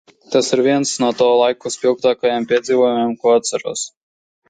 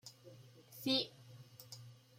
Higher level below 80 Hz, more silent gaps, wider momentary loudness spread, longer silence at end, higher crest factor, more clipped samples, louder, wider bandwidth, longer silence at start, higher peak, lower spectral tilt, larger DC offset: first, -64 dBFS vs -84 dBFS; neither; second, 8 LU vs 24 LU; first, 0.6 s vs 0.25 s; second, 16 dB vs 22 dB; neither; first, -17 LUFS vs -38 LUFS; second, 9.4 kHz vs 16 kHz; first, 0.3 s vs 0.05 s; first, -2 dBFS vs -22 dBFS; about the same, -3.5 dB/octave vs -4 dB/octave; neither